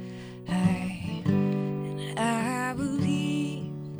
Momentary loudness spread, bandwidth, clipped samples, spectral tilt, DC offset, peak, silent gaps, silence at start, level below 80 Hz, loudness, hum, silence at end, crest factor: 7 LU; over 20 kHz; under 0.1%; -6.5 dB/octave; under 0.1%; -12 dBFS; none; 0 s; -58 dBFS; -29 LUFS; none; 0 s; 18 dB